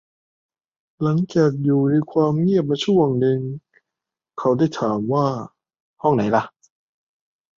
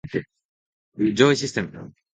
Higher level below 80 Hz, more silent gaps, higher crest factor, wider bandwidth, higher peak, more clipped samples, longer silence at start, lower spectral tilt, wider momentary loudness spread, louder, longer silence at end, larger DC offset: about the same, -60 dBFS vs -58 dBFS; second, 5.80-5.94 s vs 0.45-0.92 s; about the same, 18 dB vs 22 dB; second, 7.4 kHz vs 9.4 kHz; about the same, -4 dBFS vs -2 dBFS; neither; first, 1 s vs 0.05 s; first, -8 dB/octave vs -5 dB/octave; second, 13 LU vs 16 LU; about the same, -20 LUFS vs -22 LUFS; first, 1.1 s vs 0.3 s; neither